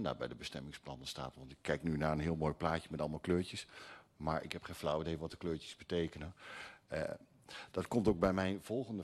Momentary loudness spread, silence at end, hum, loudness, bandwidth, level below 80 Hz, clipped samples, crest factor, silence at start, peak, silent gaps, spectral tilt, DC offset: 15 LU; 0 s; none; -39 LUFS; 13 kHz; -58 dBFS; under 0.1%; 20 dB; 0 s; -18 dBFS; none; -6 dB/octave; under 0.1%